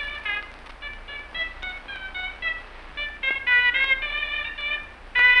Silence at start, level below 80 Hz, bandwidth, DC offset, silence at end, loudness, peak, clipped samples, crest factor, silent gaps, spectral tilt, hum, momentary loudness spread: 0 s; -44 dBFS; 10.5 kHz; under 0.1%; 0 s; -24 LUFS; -6 dBFS; under 0.1%; 20 dB; none; -2.5 dB/octave; 60 Hz at -65 dBFS; 18 LU